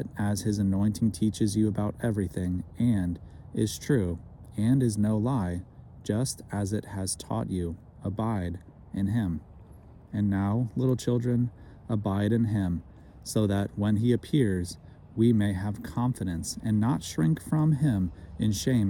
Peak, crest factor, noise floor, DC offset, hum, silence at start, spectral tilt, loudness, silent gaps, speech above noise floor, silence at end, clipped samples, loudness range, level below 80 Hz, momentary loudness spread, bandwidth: -12 dBFS; 16 dB; -50 dBFS; under 0.1%; none; 0 s; -6.5 dB/octave; -28 LUFS; none; 23 dB; 0 s; under 0.1%; 4 LU; -52 dBFS; 11 LU; 17.5 kHz